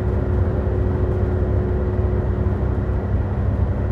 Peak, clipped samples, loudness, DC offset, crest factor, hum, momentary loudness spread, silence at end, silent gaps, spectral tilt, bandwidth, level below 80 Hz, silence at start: -8 dBFS; under 0.1%; -21 LUFS; under 0.1%; 12 dB; none; 2 LU; 0 s; none; -11 dB/octave; 4.1 kHz; -24 dBFS; 0 s